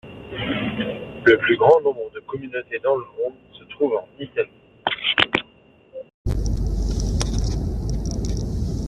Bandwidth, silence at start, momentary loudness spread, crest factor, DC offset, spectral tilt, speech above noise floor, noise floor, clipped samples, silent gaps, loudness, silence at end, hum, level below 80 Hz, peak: 11.5 kHz; 0.05 s; 15 LU; 20 dB; under 0.1%; -5.5 dB/octave; 32 dB; -53 dBFS; under 0.1%; 6.14-6.25 s; -22 LUFS; 0 s; none; -30 dBFS; -2 dBFS